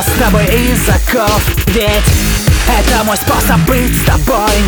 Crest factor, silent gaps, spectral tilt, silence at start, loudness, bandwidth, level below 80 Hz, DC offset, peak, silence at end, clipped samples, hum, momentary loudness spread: 10 dB; none; -4.5 dB/octave; 0 s; -11 LUFS; over 20 kHz; -16 dBFS; under 0.1%; 0 dBFS; 0 s; under 0.1%; none; 1 LU